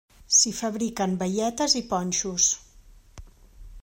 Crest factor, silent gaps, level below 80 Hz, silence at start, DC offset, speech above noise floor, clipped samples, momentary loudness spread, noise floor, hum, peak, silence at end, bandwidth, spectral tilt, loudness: 20 dB; none; -50 dBFS; 0.3 s; under 0.1%; 27 dB; under 0.1%; 9 LU; -52 dBFS; none; -6 dBFS; 0 s; 16 kHz; -2.5 dB/octave; -23 LUFS